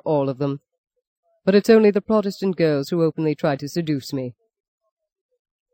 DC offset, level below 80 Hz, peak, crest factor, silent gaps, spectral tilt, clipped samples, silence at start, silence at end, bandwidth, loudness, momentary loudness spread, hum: under 0.1%; -62 dBFS; -4 dBFS; 18 dB; 0.78-0.84 s, 1.07-1.23 s; -7 dB/octave; under 0.1%; 0.05 s; 1.4 s; 16.5 kHz; -20 LUFS; 13 LU; none